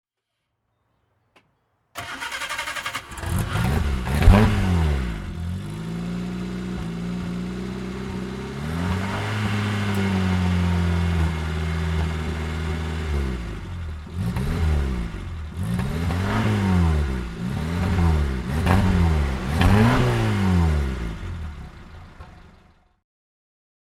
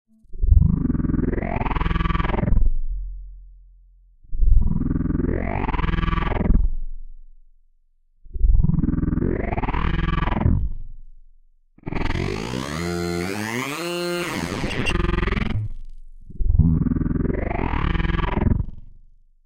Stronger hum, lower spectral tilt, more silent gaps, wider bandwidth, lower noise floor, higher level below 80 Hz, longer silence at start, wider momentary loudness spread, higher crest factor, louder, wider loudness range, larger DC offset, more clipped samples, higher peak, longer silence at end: neither; about the same, -6.5 dB/octave vs -6.5 dB/octave; neither; second, 14 kHz vs 15.5 kHz; first, -79 dBFS vs -59 dBFS; about the same, -28 dBFS vs -24 dBFS; first, 1.95 s vs 0.3 s; about the same, 12 LU vs 12 LU; about the same, 22 dB vs 20 dB; about the same, -24 LUFS vs -24 LUFS; first, 8 LU vs 3 LU; neither; neither; about the same, 0 dBFS vs -2 dBFS; first, 1.35 s vs 0.5 s